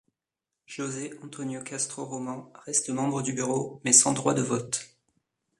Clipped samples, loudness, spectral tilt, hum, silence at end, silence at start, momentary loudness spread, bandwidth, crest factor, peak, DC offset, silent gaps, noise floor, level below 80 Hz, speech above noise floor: under 0.1%; -26 LUFS; -3 dB/octave; none; 0.75 s; 0.7 s; 19 LU; 11.5 kHz; 26 dB; -4 dBFS; under 0.1%; none; -88 dBFS; -70 dBFS; 60 dB